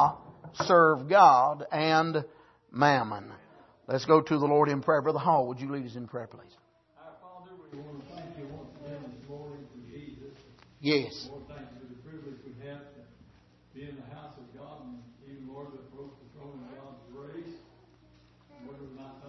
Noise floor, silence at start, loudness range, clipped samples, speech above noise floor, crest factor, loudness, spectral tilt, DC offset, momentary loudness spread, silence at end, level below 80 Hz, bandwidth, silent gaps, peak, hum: -60 dBFS; 0 s; 23 LU; under 0.1%; 35 dB; 24 dB; -25 LUFS; -6 dB/octave; under 0.1%; 26 LU; 0 s; -68 dBFS; 6.2 kHz; none; -6 dBFS; none